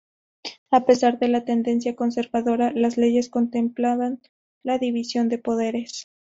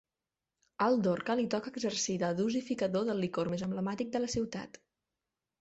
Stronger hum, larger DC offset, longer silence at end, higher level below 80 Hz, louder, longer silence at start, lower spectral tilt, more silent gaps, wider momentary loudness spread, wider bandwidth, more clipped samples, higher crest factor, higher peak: neither; neither; second, 0.35 s vs 0.95 s; about the same, -64 dBFS vs -66 dBFS; first, -22 LUFS vs -33 LUFS; second, 0.45 s vs 0.8 s; about the same, -4 dB/octave vs -5 dB/octave; first, 0.58-0.66 s, 4.29-4.61 s vs none; first, 15 LU vs 5 LU; about the same, 8 kHz vs 8.2 kHz; neither; about the same, 18 dB vs 18 dB; first, -4 dBFS vs -16 dBFS